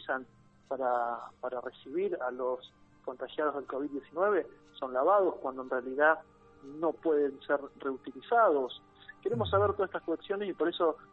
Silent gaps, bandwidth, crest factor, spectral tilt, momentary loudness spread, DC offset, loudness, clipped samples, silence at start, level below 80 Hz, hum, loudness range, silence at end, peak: none; 5.2 kHz; 20 dB; -8 dB/octave; 14 LU; under 0.1%; -32 LUFS; under 0.1%; 0 s; -68 dBFS; none; 5 LU; 0.1 s; -12 dBFS